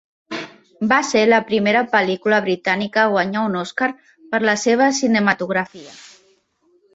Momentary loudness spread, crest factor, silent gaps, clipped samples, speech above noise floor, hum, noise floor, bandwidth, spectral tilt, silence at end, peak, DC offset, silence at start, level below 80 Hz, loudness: 15 LU; 16 dB; none; under 0.1%; 43 dB; none; -61 dBFS; 8 kHz; -4 dB/octave; 0.85 s; -2 dBFS; under 0.1%; 0.3 s; -64 dBFS; -18 LUFS